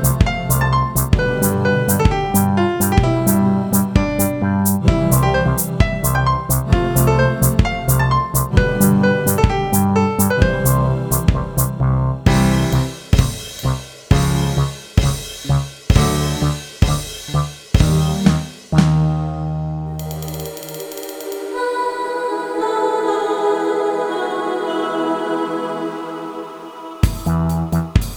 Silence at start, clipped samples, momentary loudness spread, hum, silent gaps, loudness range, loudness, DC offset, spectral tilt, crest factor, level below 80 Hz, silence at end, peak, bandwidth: 0 s; under 0.1%; 10 LU; none; none; 6 LU; -17 LUFS; under 0.1%; -5.5 dB/octave; 16 dB; -26 dBFS; 0 s; 0 dBFS; over 20 kHz